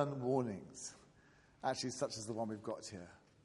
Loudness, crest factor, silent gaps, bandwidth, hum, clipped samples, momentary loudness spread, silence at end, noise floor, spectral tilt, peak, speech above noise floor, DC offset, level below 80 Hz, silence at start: -42 LUFS; 22 dB; none; 11.5 kHz; none; under 0.1%; 14 LU; 0.25 s; -67 dBFS; -5 dB/octave; -20 dBFS; 26 dB; under 0.1%; -76 dBFS; 0 s